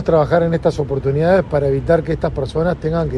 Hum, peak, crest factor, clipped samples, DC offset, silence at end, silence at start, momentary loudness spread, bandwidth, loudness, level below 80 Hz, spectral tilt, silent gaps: none; 0 dBFS; 16 dB; under 0.1%; under 0.1%; 0 s; 0 s; 6 LU; 11 kHz; -17 LUFS; -32 dBFS; -8.5 dB/octave; none